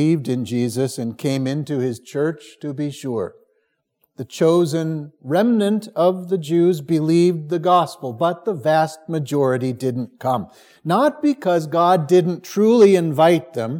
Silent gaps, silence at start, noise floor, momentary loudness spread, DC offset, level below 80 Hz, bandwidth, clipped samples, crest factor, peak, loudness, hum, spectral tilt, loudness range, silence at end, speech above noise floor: none; 0 s; -69 dBFS; 11 LU; under 0.1%; -70 dBFS; 17.5 kHz; under 0.1%; 18 dB; -2 dBFS; -19 LUFS; none; -7 dB/octave; 7 LU; 0 s; 51 dB